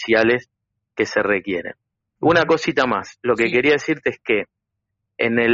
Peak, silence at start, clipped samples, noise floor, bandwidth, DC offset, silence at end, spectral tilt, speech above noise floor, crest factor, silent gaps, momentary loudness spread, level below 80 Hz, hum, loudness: -2 dBFS; 0 s; under 0.1%; -79 dBFS; 7.4 kHz; under 0.1%; 0 s; -3 dB/octave; 60 dB; 18 dB; none; 10 LU; -54 dBFS; none; -19 LUFS